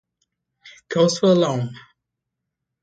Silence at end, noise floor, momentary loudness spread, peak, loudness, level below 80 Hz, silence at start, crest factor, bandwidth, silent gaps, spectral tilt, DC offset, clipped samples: 1.05 s; -81 dBFS; 11 LU; -6 dBFS; -19 LUFS; -66 dBFS; 0.65 s; 18 dB; 9.2 kHz; none; -5.5 dB/octave; under 0.1%; under 0.1%